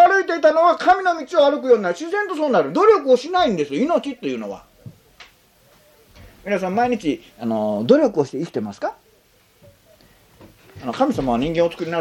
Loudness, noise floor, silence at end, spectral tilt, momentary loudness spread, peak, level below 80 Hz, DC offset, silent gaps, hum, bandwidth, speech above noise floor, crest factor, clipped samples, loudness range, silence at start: -19 LUFS; -56 dBFS; 0 s; -5.5 dB/octave; 12 LU; -2 dBFS; -52 dBFS; under 0.1%; none; none; 15.5 kHz; 38 dB; 18 dB; under 0.1%; 10 LU; 0 s